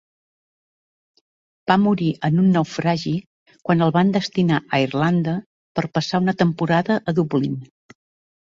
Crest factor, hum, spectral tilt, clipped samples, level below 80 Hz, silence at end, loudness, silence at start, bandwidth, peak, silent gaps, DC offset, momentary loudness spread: 18 dB; none; -7 dB/octave; under 0.1%; -58 dBFS; 0.9 s; -20 LUFS; 1.65 s; 7.6 kHz; -2 dBFS; 3.26-3.46 s, 5.46-5.75 s; under 0.1%; 10 LU